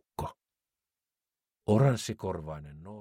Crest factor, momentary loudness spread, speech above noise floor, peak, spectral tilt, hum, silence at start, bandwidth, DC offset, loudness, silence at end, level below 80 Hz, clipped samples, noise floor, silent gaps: 20 dB; 18 LU; over 61 dB; -12 dBFS; -7 dB/octave; none; 0.2 s; 15 kHz; under 0.1%; -30 LUFS; 0 s; -56 dBFS; under 0.1%; under -90 dBFS; none